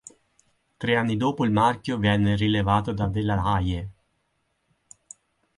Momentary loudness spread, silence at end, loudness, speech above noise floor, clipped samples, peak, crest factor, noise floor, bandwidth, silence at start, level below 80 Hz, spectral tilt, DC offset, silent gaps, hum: 7 LU; 1.65 s; -24 LUFS; 50 dB; under 0.1%; -8 dBFS; 18 dB; -73 dBFS; 11 kHz; 0.8 s; -42 dBFS; -6.5 dB/octave; under 0.1%; none; none